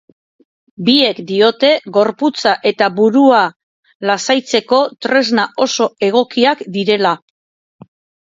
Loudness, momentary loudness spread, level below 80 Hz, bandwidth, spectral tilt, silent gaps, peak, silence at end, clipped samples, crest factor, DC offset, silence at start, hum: -14 LUFS; 6 LU; -64 dBFS; 7.8 kHz; -4 dB/octave; 3.56-3.83 s, 3.95-4.00 s; 0 dBFS; 1.1 s; under 0.1%; 14 dB; under 0.1%; 0.8 s; none